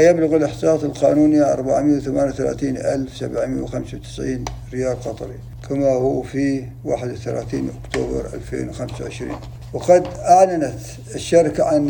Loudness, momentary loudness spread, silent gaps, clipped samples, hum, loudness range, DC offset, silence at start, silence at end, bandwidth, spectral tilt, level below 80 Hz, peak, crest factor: -20 LUFS; 14 LU; none; under 0.1%; none; 7 LU; under 0.1%; 0 s; 0 s; 19 kHz; -6.5 dB/octave; -40 dBFS; -2 dBFS; 18 dB